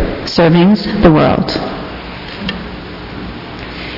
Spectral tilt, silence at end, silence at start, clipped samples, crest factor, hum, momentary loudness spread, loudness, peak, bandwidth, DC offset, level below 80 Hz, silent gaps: -7.5 dB/octave; 0 s; 0 s; 0.2%; 14 dB; none; 18 LU; -12 LUFS; 0 dBFS; 6 kHz; under 0.1%; -30 dBFS; none